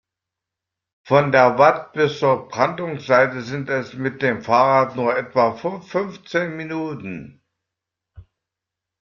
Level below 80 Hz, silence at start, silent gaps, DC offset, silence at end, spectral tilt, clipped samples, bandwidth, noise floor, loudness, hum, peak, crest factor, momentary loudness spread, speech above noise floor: -60 dBFS; 1.05 s; none; under 0.1%; 0.8 s; -6.5 dB/octave; under 0.1%; 7.2 kHz; -85 dBFS; -19 LUFS; none; -2 dBFS; 20 dB; 12 LU; 66 dB